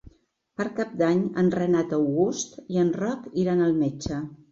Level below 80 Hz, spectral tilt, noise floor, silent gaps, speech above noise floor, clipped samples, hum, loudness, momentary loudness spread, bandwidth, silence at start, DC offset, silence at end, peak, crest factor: -54 dBFS; -6.5 dB/octave; -55 dBFS; none; 30 dB; under 0.1%; none; -25 LUFS; 10 LU; 8 kHz; 0.6 s; under 0.1%; 0.15 s; -10 dBFS; 14 dB